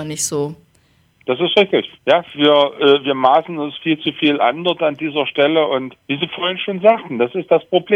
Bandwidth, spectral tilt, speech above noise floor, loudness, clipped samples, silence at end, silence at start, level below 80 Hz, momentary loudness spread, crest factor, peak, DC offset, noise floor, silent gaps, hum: 16 kHz; -4 dB/octave; 40 dB; -16 LUFS; under 0.1%; 0 s; 0 s; -64 dBFS; 9 LU; 16 dB; 0 dBFS; under 0.1%; -56 dBFS; none; none